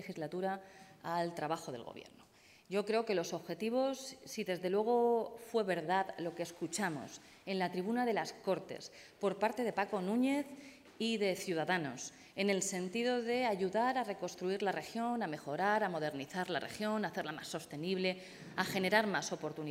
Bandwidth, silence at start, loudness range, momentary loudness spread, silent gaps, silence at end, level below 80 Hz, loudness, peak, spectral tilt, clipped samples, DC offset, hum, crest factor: 16 kHz; 0 s; 3 LU; 12 LU; none; 0 s; -80 dBFS; -37 LUFS; -14 dBFS; -4.5 dB/octave; under 0.1%; under 0.1%; none; 22 dB